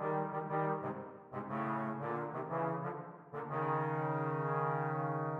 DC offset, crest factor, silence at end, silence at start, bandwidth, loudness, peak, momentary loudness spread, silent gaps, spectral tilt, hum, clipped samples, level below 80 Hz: under 0.1%; 14 dB; 0 s; 0 s; 4.3 kHz; -38 LUFS; -24 dBFS; 11 LU; none; -10 dB/octave; none; under 0.1%; -82 dBFS